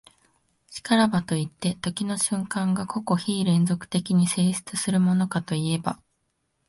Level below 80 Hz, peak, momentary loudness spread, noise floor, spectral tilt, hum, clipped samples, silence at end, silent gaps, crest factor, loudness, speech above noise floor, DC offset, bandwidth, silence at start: -62 dBFS; -8 dBFS; 7 LU; -74 dBFS; -5 dB/octave; none; under 0.1%; 0.75 s; none; 18 dB; -24 LUFS; 50 dB; under 0.1%; 11.5 kHz; 0.7 s